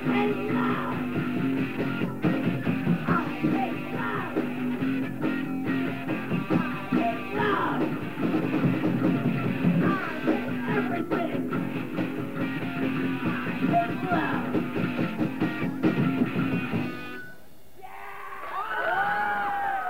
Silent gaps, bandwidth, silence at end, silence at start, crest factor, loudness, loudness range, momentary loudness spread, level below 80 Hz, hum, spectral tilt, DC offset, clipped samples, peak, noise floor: none; 16 kHz; 0 s; 0 s; 16 dB; -27 LUFS; 3 LU; 6 LU; -60 dBFS; none; -8 dB/octave; 0.9%; under 0.1%; -10 dBFS; -52 dBFS